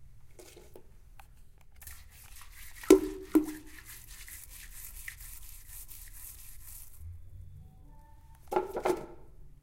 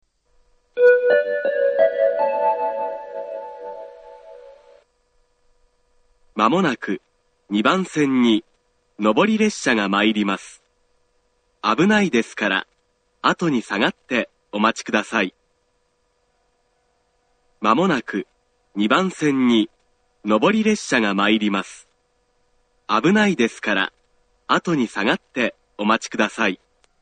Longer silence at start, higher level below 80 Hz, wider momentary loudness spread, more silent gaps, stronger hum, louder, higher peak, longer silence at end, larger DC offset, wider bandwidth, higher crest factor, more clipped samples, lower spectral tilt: second, 0 s vs 0.75 s; first, -52 dBFS vs -62 dBFS; first, 24 LU vs 14 LU; neither; neither; second, -31 LUFS vs -20 LUFS; second, -6 dBFS vs 0 dBFS; second, 0.05 s vs 0.45 s; neither; first, 16.5 kHz vs 9.4 kHz; first, 30 dB vs 20 dB; neither; about the same, -5 dB/octave vs -5 dB/octave